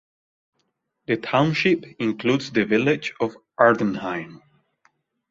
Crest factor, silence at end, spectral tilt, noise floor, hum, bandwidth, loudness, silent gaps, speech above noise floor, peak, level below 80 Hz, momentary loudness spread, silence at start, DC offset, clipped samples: 22 dB; 0.95 s; -6.5 dB/octave; -74 dBFS; none; 7.8 kHz; -22 LUFS; none; 52 dB; 0 dBFS; -62 dBFS; 11 LU; 1.1 s; under 0.1%; under 0.1%